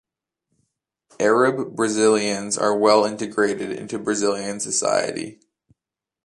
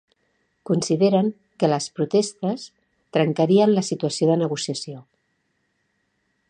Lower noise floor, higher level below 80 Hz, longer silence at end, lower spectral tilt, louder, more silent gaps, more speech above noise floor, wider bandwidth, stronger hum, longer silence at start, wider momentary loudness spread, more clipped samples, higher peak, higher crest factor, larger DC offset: first, -88 dBFS vs -71 dBFS; about the same, -66 dBFS vs -70 dBFS; second, 0.9 s vs 1.5 s; second, -3.5 dB/octave vs -6 dB/octave; about the same, -21 LUFS vs -22 LUFS; neither; first, 67 dB vs 50 dB; first, 11.5 kHz vs 10 kHz; neither; first, 1.2 s vs 0.7 s; about the same, 11 LU vs 12 LU; neither; about the same, -4 dBFS vs -6 dBFS; about the same, 20 dB vs 18 dB; neither